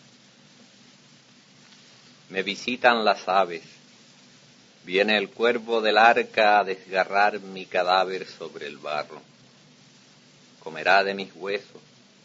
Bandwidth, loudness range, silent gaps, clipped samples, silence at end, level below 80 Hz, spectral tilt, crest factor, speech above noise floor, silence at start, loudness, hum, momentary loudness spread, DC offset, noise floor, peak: 7.8 kHz; 7 LU; none; under 0.1%; 0.65 s; -78 dBFS; -3.5 dB/octave; 22 dB; 31 dB; 2.3 s; -23 LUFS; none; 17 LU; under 0.1%; -54 dBFS; -4 dBFS